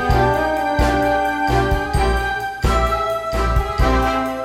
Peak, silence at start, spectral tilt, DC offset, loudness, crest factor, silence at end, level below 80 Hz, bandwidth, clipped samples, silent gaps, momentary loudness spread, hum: -4 dBFS; 0 s; -6 dB/octave; under 0.1%; -18 LUFS; 14 dB; 0 s; -24 dBFS; 16 kHz; under 0.1%; none; 4 LU; none